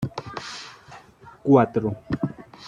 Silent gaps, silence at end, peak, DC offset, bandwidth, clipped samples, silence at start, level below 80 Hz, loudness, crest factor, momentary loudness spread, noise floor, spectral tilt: none; 0 s; -2 dBFS; under 0.1%; 10 kHz; under 0.1%; 0 s; -54 dBFS; -24 LUFS; 22 dB; 20 LU; -48 dBFS; -7.5 dB/octave